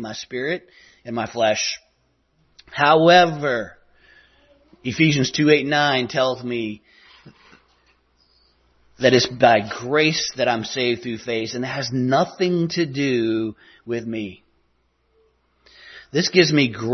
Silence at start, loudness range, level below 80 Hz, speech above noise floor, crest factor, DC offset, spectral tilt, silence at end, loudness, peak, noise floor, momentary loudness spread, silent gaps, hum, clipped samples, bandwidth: 0 s; 6 LU; -60 dBFS; 46 dB; 20 dB; under 0.1%; -4.5 dB/octave; 0 s; -20 LUFS; -2 dBFS; -66 dBFS; 14 LU; none; none; under 0.1%; 6.4 kHz